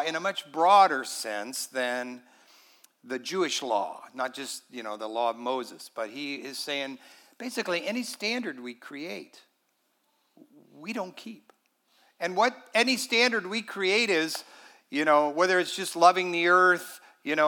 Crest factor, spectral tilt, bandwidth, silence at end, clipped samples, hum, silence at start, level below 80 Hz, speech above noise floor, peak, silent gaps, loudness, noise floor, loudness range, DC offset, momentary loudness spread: 24 dB; -2.5 dB/octave; 18 kHz; 0 s; under 0.1%; none; 0 s; under -90 dBFS; 46 dB; -6 dBFS; none; -27 LUFS; -73 dBFS; 12 LU; under 0.1%; 18 LU